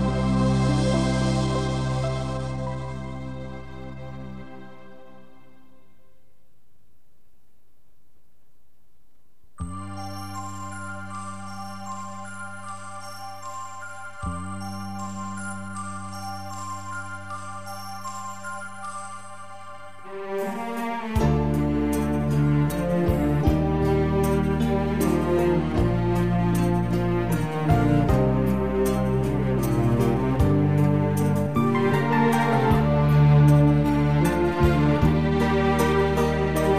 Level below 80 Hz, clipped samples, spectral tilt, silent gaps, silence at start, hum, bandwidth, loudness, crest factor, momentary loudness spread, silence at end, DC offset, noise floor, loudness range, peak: -36 dBFS; under 0.1%; -7.5 dB/octave; none; 0 s; none; 15 kHz; -23 LUFS; 16 dB; 16 LU; 0 s; 1%; -66 dBFS; 17 LU; -6 dBFS